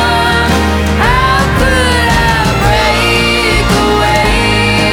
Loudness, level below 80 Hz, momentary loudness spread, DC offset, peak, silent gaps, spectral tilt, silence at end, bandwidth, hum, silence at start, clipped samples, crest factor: -9 LUFS; -18 dBFS; 1 LU; under 0.1%; 0 dBFS; none; -4.5 dB/octave; 0 s; 18 kHz; none; 0 s; under 0.1%; 10 dB